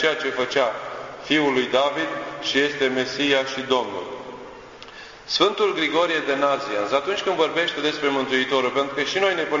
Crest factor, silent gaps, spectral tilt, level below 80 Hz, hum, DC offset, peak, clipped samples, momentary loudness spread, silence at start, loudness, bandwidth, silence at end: 20 dB; none; -3.5 dB/octave; -60 dBFS; none; under 0.1%; -4 dBFS; under 0.1%; 14 LU; 0 s; -22 LUFS; 7.6 kHz; 0 s